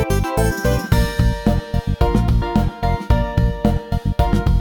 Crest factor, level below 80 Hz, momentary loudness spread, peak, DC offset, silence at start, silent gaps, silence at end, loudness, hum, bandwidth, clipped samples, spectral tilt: 14 dB; -22 dBFS; 4 LU; -2 dBFS; under 0.1%; 0 s; none; 0 s; -19 LUFS; none; 18 kHz; under 0.1%; -7 dB/octave